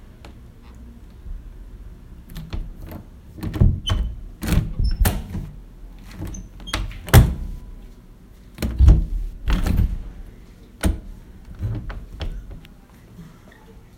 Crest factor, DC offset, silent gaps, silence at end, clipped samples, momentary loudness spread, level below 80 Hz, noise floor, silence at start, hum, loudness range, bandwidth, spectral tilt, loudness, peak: 22 dB; under 0.1%; none; 0.2 s; under 0.1%; 27 LU; -26 dBFS; -45 dBFS; 0 s; none; 11 LU; 17 kHz; -5.5 dB/octave; -23 LUFS; 0 dBFS